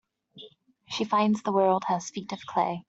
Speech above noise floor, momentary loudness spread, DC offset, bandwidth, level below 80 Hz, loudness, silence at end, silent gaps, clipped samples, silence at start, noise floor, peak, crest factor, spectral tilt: 27 dB; 12 LU; under 0.1%; 8 kHz; -72 dBFS; -27 LUFS; 0.05 s; none; under 0.1%; 0.35 s; -53 dBFS; -10 dBFS; 18 dB; -5.5 dB/octave